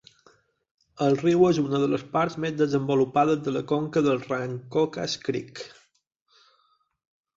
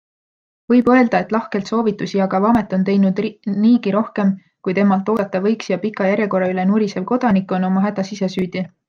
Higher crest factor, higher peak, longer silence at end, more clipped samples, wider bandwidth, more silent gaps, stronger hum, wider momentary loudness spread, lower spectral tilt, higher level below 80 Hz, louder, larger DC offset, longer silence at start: about the same, 18 dB vs 16 dB; second, -8 dBFS vs -2 dBFS; first, 1.7 s vs 0.2 s; neither; about the same, 7.8 kHz vs 7.2 kHz; neither; neither; about the same, 9 LU vs 7 LU; about the same, -6.5 dB/octave vs -7.5 dB/octave; second, -64 dBFS vs -56 dBFS; second, -25 LUFS vs -18 LUFS; neither; first, 0.95 s vs 0.7 s